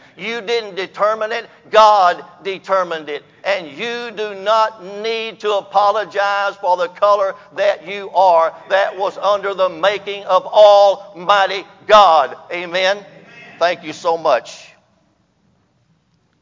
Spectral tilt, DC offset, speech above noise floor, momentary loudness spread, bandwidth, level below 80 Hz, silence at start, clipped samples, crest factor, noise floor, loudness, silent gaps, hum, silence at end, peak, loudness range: -3 dB/octave; under 0.1%; 44 dB; 14 LU; 7.6 kHz; -62 dBFS; 0.2 s; under 0.1%; 16 dB; -60 dBFS; -16 LUFS; none; none; 1.8 s; 0 dBFS; 7 LU